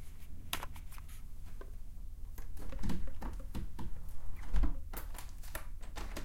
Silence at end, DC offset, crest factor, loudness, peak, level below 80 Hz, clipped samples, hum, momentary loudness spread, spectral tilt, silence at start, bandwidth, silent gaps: 0 s; under 0.1%; 18 dB; -46 LUFS; -16 dBFS; -40 dBFS; under 0.1%; none; 12 LU; -4.5 dB/octave; 0 s; 17 kHz; none